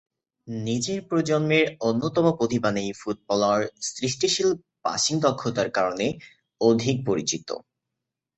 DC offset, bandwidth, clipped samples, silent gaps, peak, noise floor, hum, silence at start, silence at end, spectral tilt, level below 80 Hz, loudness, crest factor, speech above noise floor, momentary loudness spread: under 0.1%; 8.6 kHz; under 0.1%; none; -6 dBFS; -85 dBFS; none; 0.45 s; 0.75 s; -4.5 dB/octave; -62 dBFS; -24 LUFS; 18 dB; 61 dB; 9 LU